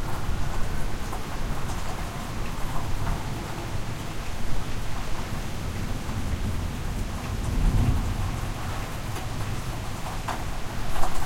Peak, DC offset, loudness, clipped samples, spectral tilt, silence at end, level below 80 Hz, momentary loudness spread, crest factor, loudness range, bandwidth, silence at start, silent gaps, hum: -8 dBFS; under 0.1%; -32 LUFS; under 0.1%; -5 dB/octave; 0 s; -30 dBFS; 5 LU; 18 dB; 3 LU; 16.5 kHz; 0 s; none; none